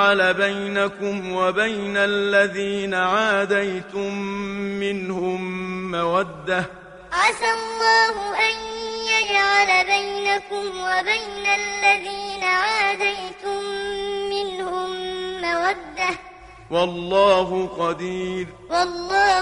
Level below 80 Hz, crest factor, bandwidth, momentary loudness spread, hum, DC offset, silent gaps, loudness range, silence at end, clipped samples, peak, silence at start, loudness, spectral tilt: -52 dBFS; 18 dB; 11 kHz; 11 LU; none; under 0.1%; none; 6 LU; 0 s; under 0.1%; -4 dBFS; 0 s; -21 LUFS; -3.5 dB/octave